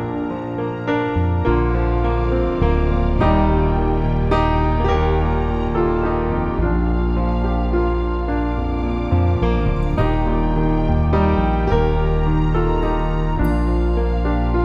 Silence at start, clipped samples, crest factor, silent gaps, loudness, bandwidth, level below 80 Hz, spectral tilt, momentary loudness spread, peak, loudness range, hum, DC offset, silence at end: 0 s; under 0.1%; 14 dB; none; -19 LUFS; 6.2 kHz; -20 dBFS; -9.5 dB/octave; 4 LU; -4 dBFS; 2 LU; none; under 0.1%; 0 s